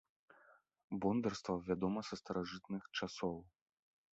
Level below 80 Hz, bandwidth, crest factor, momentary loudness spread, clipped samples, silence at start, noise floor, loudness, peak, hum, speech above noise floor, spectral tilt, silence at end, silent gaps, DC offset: -68 dBFS; 8 kHz; 18 dB; 8 LU; under 0.1%; 0.5 s; -69 dBFS; -41 LUFS; -24 dBFS; none; 29 dB; -5 dB/octave; 0.65 s; 0.84-0.88 s; under 0.1%